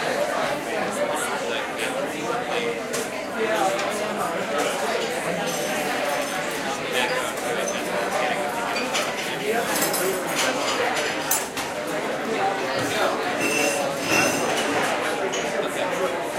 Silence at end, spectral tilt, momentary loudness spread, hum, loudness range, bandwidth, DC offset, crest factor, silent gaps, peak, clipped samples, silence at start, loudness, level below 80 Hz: 0 s; -2.5 dB/octave; 5 LU; none; 3 LU; 16 kHz; under 0.1%; 18 dB; none; -6 dBFS; under 0.1%; 0 s; -24 LUFS; -60 dBFS